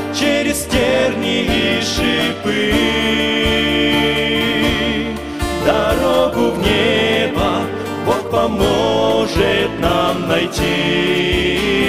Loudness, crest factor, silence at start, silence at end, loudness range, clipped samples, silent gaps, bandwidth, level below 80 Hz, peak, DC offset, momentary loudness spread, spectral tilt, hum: -15 LUFS; 14 dB; 0 s; 0 s; 1 LU; under 0.1%; none; 16 kHz; -32 dBFS; 0 dBFS; 0.6%; 4 LU; -4.5 dB/octave; none